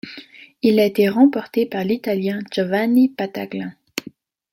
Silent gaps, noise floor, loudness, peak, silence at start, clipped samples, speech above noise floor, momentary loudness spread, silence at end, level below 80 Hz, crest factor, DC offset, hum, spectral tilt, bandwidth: none; -43 dBFS; -19 LUFS; -2 dBFS; 0.05 s; under 0.1%; 25 dB; 15 LU; 0.5 s; -66 dBFS; 16 dB; under 0.1%; none; -6.5 dB/octave; 16.5 kHz